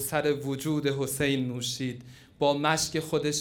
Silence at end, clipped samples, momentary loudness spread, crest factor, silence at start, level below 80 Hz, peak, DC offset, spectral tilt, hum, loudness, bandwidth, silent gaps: 0 s; under 0.1%; 6 LU; 20 dB; 0 s; -60 dBFS; -8 dBFS; under 0.1%; -4 dB/octave; none; -28 LUFS; over 20 kHz; none